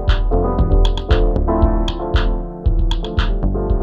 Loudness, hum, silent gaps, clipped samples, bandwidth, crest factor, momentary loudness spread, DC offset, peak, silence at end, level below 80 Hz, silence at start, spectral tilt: -19 LUFS; none; none; under 0.1%; 7 kHz; 14 dB; 4 LU; under 0.1%; -2 dBFS; 0 s; -16 dBFS; 0 s; -7.5 dB/octave